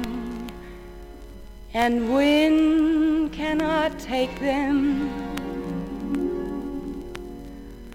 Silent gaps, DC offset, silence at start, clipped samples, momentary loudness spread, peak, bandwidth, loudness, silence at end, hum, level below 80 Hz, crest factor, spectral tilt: none; under 0.1%; 0 s; under 0.1%; 22 LU; -10 dBFS; 16 kHz; -24 LUFS; 0 s; none; -42 dBFS; 16 dB; -5.5 dB/octave